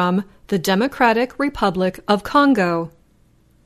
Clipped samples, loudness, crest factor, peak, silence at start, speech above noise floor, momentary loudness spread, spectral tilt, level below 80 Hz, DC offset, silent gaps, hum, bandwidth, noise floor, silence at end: under 0.1%; -18 LUFS; 18 dB; 0 dBFS; 0 s; 37 dB; 9 LU; -5.5 dB/octave; -48 dBFS; under 0.1%; none; none; 13.5 kHz; -56 dBFS; 0.75 s